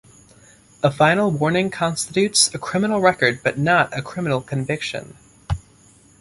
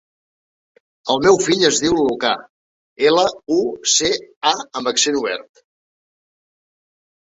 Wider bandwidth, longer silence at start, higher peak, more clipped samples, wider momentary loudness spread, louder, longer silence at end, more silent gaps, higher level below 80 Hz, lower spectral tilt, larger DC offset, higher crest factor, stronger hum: first, 11.5 kHz vs 8.4 kHz; second, 0.85 s vs 1.05 s; about the same, -2 dBFS vs -2 dBFS; neither; first, 12 LU vs 8 LU; second, -20 LUFS vs -17 LUFS; second, 0.6 s vs 1.8 s; second, none vs 2.50-2.96 s, 4.36-4.41 s; first, -44 dBFS vs -54 dBFS; first, -4 dB/octave vs -2 dB/octave; neither; about the same, 18 dB vs 18 dB; neither